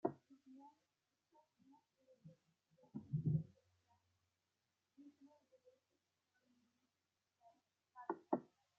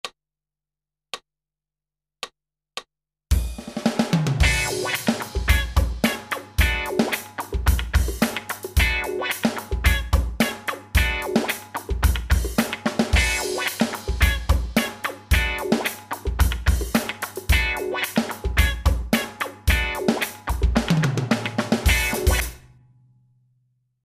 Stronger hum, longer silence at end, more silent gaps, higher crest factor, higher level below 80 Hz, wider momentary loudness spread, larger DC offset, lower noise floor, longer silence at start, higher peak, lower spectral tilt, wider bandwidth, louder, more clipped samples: neither; second, 0.35 s vs 1.5 s; neither; first, 28 dB vs 18 dB; second, -80 dBFS vs -26 dBFS; first, 25 LU vs 10 LU; neither; about the same, under -90 dBFS vs -90 dBFS; about the same, 0.05 s vs 0.05 s; second, -22 dBFS vs -4 dBFS; first, -10.5 dB/octave vs -4.5 dB/octave; second, 3.6 kHz vs 16 kHz; second, -46 LUFS vs -23 LUFS; neither